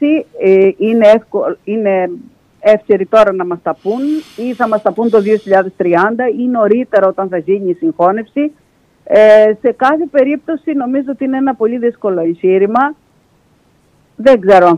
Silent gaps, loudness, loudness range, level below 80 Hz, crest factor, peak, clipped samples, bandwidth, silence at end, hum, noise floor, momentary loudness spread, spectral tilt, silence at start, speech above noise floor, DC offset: none; -12 LUFS; 3 LU; -54 dBFS; 12 dB; 0 dBFS; under 0.1%; 9.4 kHz; 0 s; none; -52 dBFS; 10 LU; -7.5 dB/octave; 0 s; 41 dB; under 0.1%